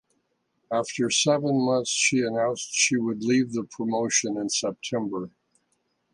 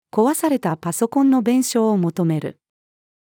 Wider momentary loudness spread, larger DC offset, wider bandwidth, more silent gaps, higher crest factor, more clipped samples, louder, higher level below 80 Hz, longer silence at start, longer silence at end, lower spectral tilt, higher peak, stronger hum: about the same, 8 LU vs 6 LU; neither; second, 11.5 kHz vs 18.5 kHz; neither; about the same, 18 dB vs 14 dB; neither; second, -24 LUFS vs -19 LUFS; about the same, -70 dBFS vs -72 dBFS; first, 0.7 s vs 0.15 s; about the same, 0.85 s vs 0.9 s; second, -3 dB/octave vs -6 dB/octave; second, -8 dBFS vs -4 dBFS; neither